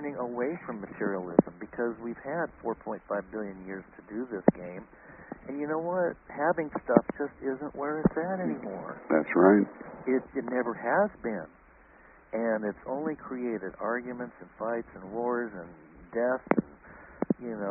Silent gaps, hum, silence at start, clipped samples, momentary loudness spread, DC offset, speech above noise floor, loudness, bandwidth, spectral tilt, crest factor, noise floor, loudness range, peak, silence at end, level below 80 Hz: none; none; 0 s; under 0.1%; 15 LU; under 0.1%; 26 dB; -31 LUFS; 3 kHz; -3 dB/octave; 30 dB; -56 dBFS; 7 LU; -2 dBFS; 0 s; -60 dBFS